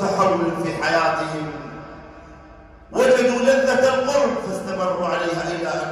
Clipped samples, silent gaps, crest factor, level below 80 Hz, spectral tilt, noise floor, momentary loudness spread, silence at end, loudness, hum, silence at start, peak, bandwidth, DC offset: under 0.1%; none; 16 dB; -50 dBFS; -4.5 dB/octave; -44 dBFS; 15 LU; 0 s; -20 LUFS; none; 0 s; -4 dBFS; 14.5 kHz; under 0.1%